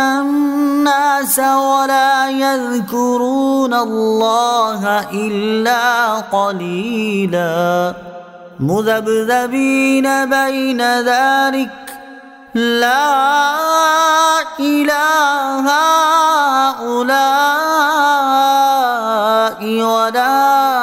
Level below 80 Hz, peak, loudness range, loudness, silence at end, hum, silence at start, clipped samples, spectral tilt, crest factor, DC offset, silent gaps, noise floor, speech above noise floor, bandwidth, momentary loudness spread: -60 dBFS; -2 dBFS; 4 LU; -14 LUFS; 0 s; none; 0 s; under 0.1%; -3.5 dB/octave; 12 dB; under 0.1%; none; -37 dBFS; 23 dB; 16.5 kHz; 6 LU